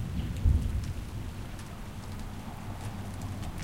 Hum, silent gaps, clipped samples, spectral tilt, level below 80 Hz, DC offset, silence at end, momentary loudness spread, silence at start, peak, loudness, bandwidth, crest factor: none; none; under 0.1%; -6.5 dB/octave; -36 dBFS; 0.3%; 0 s; 13 LU; 0 s; -12 dBFS; -36 LUFS; 16.5 kHz; 20 dB